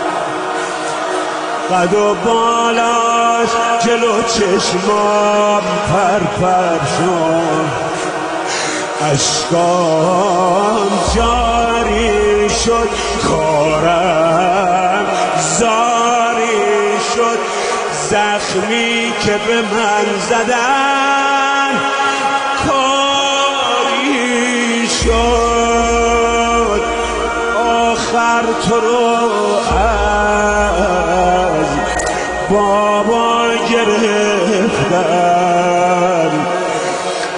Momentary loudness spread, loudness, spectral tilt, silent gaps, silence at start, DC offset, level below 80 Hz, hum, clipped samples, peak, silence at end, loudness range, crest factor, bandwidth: 4 LU; -13 LUFS; -3.5 dB/octave; none; 0 s; under 0.1%; -32 dBFS; none; under 0.1%; 0 dBFS; 0 s; 2 LU; 12 dB; 10.5 kHz